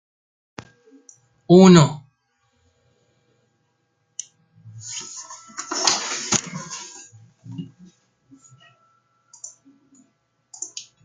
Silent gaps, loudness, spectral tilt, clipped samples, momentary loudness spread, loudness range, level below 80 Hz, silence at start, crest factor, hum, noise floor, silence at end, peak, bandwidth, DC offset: none; -18 LUFS; -5 dB/octave; under 0.1%; 29 LU; 23 LU; -62 dBFS; 1.5 s; 22 dB; none; -69 dBFS; 0.25 s; -2 dBFS; 9.6 kHz; under 0.1%